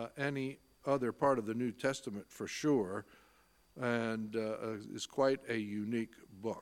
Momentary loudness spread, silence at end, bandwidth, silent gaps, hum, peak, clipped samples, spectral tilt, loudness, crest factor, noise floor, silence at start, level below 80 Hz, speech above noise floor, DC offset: 11 LU; 0 s; 16.5 kHz; none; none; -18 dBFS; under 0.1%; -5.5 dB/octave; -37 LUFS; 20 dB; -68 dBFS; 0 s; -74 dBFS; 32 dB; under 0.1%